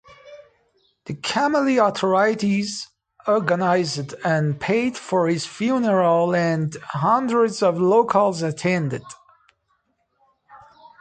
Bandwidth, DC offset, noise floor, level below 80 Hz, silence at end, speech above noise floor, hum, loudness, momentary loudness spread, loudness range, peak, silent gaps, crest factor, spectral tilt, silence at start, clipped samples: 9.4 kHz; under 0.1%; -69 dBFS; -64 dBFS; 0.45 s; 49 dB; none; -20 LUFS; 10 LU; 3 LU; -4 dBFS; none; 18 dB; -5.5 dB/octave; 0.1 s; under 0.1%